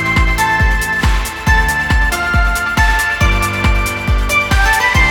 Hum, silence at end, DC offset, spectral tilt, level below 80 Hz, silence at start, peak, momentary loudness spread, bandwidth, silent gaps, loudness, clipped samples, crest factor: none; 0 s; under 0.1%; -4 dB/octave; -16 dBFS; 0 s; 0 dBFS; 4 LU; 18 kHz; none; -13 LUFS; under 0.1%; 12 dB